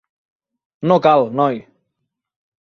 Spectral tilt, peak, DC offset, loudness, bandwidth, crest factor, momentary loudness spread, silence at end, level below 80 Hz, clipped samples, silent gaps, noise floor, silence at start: -8 dB/octave; -2 dBFS; under 0.1%; -16 LUFS; 6.4 kHz; 18 dB; 12 LU; 1.05 s; -62 dBFS; under 0.1%; none; -77 dBFS; 0.8 s